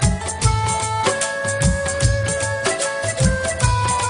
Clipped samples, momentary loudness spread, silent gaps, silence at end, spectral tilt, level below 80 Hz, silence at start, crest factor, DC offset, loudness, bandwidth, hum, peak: under 0.1%; 2 LU; none; 0 s; -4 dB/octave; -28 dBFS; 0 s; 16 dB; under 0.1%; -19 LUFS; 11 kHz; none; -2 dBFS